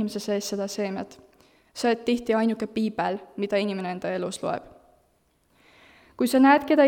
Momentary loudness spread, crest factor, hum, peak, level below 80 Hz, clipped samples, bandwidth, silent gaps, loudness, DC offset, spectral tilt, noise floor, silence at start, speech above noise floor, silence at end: 13 LU; 20 dB; none; -6 dBFS; -64 dBFS; under 0.1%; 18 kHz; none; -25 LUFS; under 0.1%; -5 dB/octave; -66 dBFS; 0 s; 42 dB; 0 s